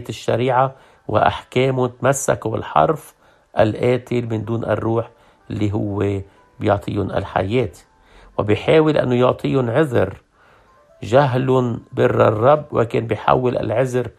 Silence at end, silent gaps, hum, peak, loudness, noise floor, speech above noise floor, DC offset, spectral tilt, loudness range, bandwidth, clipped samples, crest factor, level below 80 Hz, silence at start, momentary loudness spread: 0.1 s; none; none; 0 dBFS; -19 LUFS; -52 dBFS; 34 dB; under 0.1%; -6.5 dB/octave; 5 LU; 13.5 kHz; under 0.1%; 18 dB; -50 dBFS; 0 s; 9 LU